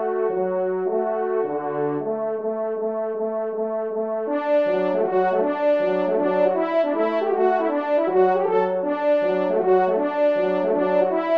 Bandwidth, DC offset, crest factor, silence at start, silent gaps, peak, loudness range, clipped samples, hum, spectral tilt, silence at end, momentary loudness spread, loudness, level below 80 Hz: 5.4 kHz; 0.1%; 14 dB; 0 s; none; -8 dBFS; 4 LU; under 0.1%; none; -8.5 dB/octave; 0 s; 7 LU; -22 LUFS; -74 dBFS